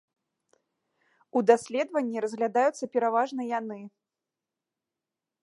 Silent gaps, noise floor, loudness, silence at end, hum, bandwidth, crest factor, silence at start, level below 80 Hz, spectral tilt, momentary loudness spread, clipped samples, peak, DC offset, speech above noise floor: none; -89 dBFS; -27 LUFS; 1.55 s; none; 11.5 kHz; 24 dB; 1.35 s; -84 dBFS; -5 dB/octave; 9 LU; under 0.1%; -6 dBFS; under 0.1%; 62 dB